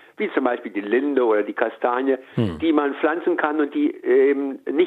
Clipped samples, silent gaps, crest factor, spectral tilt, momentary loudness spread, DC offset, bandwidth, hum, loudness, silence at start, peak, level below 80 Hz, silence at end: under 0.1%; none; 18 dB; -8.5 dB/octave; 6 LU; under 0.1%; 4.5 kHz; none; -21 LUFS; 0.2 s; -4 dBFS; -62 dBFS; 0 s